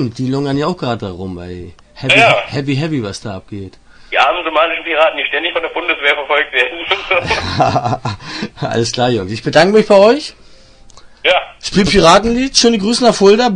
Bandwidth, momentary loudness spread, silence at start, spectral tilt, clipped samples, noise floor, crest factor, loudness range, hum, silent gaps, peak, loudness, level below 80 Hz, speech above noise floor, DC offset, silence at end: 10.5 kHz; 16 LU; 0 s; -4 dB/octave; under 0.1%; -40 dBFS; 14 dB; 4 LU; none; none; 0 dBFS; -13 LUFS; -40 dBFS; 27 dB; under 0.1%; 0 s